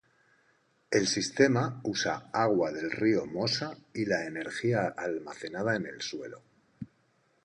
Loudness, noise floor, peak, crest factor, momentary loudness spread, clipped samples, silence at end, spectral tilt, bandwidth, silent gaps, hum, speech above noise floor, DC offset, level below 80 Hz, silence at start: -30 LUFS; -70 dBFS; -10 dBFS; 22 dB; 14 LU; under 0.1%; 0.6 s; -4.5 dB/octave; 10.5 kHz; none; none; 40 dB; under 0.1%; -68 dBFS; 0.9 s